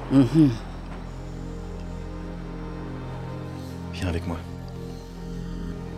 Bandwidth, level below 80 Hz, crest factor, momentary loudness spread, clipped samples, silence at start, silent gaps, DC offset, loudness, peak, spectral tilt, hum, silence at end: 13 kHz; -38 dBFS; 20 dB; 17 LU; under 0.1%; 0 s; none; under 0.1%; -29 LUFS; -6 dBFS; -8 dB/octave; none; 0 s